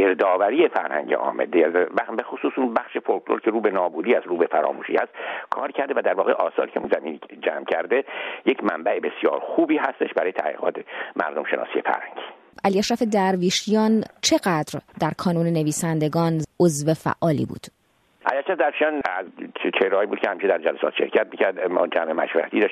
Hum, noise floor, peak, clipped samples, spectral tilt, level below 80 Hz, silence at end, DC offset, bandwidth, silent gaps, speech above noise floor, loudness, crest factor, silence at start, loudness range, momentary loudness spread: none; -51 dBFS; -2 dBFS; under 0.1%; -5 dB/octave; -64 dBFS; 0 s; under 0.1%; 13.5 kHz; none; 28 dB; -23 LUFS; 20 dB; 0 s; 3 LU; 8 LU